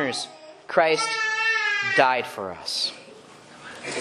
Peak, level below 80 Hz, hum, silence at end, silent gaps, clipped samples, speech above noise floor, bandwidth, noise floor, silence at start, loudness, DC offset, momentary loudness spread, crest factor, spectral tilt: -2 dBFS; -72 dBFS; none; 0 s; none; under 0.1%; 23 dB; 13 kHz; -47 dBFS; 0 s; -23 LUFS; under 0.1%; 17 LU; 24 dB; -2 dB/octave